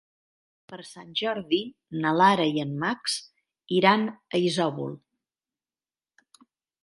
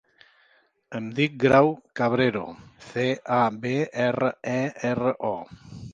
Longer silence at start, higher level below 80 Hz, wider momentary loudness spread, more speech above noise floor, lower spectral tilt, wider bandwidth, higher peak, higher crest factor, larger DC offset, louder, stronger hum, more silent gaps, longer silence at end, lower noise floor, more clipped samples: second, 0.7 s vs 0.9 s; second, -72 dBFS vs -60 dBFS; first, 20 LU vs 16 LU; first, over 65 dB vs 39 dB; second, -5 dB/octave vs -6.5 dB/octave; first, 11.5 kHz vs 7.6 kHz; about the same, -4 dBFS vs -4 dBFS; about the same, 24 dB vs 22 dB; neither; about the same, -25 LUFS vs -24 LUFS; neither; neither; first, 1.85 s vs 0 s; first, under -90 dBFS vs -63 dBFS; neither